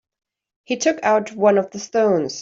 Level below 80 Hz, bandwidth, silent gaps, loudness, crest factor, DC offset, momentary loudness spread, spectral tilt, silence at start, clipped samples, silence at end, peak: -66 dBFS; 7.8 kHz; none; -19 LUFS; 16 dB; under 0.1%; 5 LU; -4.5 dB/octave; 0.7 s; under 0.1%; 0 s; -4 dBFS